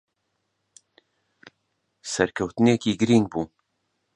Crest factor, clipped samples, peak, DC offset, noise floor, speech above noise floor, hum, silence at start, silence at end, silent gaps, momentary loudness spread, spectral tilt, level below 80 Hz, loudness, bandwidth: 24 dB; under 0.1%; -4 dBFS; under 0.1%; -76 dBFS; 55 dB; none; 2.05 s; 0.7 s; none; 13 LU; -5.5 dB/octave; -58 dBFS; -23 LUFS; 10.5 kHz